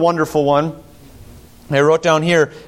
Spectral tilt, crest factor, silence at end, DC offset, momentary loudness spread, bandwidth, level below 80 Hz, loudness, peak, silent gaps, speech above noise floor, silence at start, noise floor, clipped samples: -5.5 dB/octave; 14 dB; 0.1 s; under 0.1%; 6 LU; 16 kHz; -48 dBFS; -15 LUFS; -2 dBFS; none; 26 dB; 0 s; -40 dBFS; under 0.1%